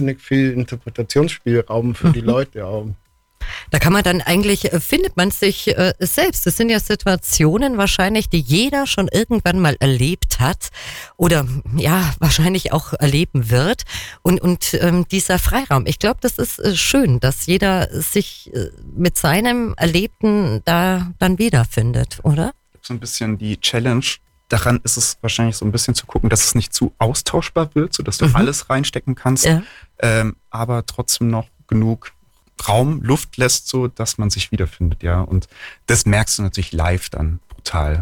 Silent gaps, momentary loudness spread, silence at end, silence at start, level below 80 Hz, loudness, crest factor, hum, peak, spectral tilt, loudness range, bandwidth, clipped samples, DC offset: none; 9 LU; 0 s; 0 s; -30 dBFS; -17 LUFS; 14 dB; none; -4 dBFS; -4.5 dB/octave; 3 LU; 19 kHz; under 0.1%; under 0.1%